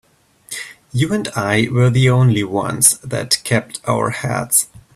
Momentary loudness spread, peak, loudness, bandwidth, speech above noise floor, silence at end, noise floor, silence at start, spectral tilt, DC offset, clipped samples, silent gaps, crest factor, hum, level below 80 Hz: 11 LU; 0 dBFS; -16 LUFS; 16 kHz; 23 dB; 0.15 s; -39 dBFS; 0.5 s; -4 dB/octave; under 0.1%; under 0.1%; none; 18 dB; none; -48 dBFS